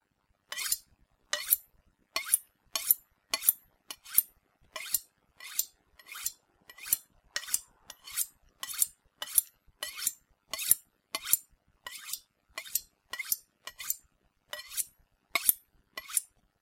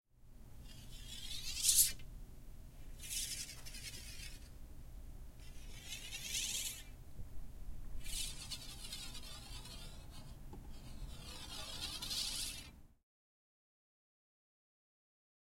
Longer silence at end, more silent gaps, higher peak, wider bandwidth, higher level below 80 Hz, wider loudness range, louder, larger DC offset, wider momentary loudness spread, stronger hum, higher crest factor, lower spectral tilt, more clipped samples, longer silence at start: second, 0.35 s vs 2.55 s; neither; first, -2 dBFS vs -16 dBFS; about the same, 17 kHz vs 16.5 kHz; second, -72 dBFS vs -52 dBFS; second, 6 LU vs 11 LU; first, -31 LUFS vs -40 LUFS; neither; about the same, 18 LU vs 19 LU; neither; about the same, 34 dB vs 30 dB; second, 2.5 dB/octave vs -0.5 dB/octave; neither; first, 0.5 s vs 0.15 s